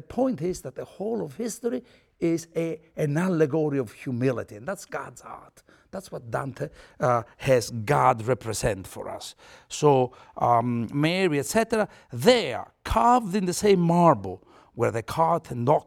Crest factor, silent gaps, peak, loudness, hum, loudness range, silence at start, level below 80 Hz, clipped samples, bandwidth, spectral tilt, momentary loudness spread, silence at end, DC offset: 20 dB; none; -4 dBFS; -25 LUFS; none; 7 LU; 0.1 s; -50 dBFS; under 0.1%; 17 kHz; -5.5 dB/octave; 16 LU; 0.05 s; under 0.1%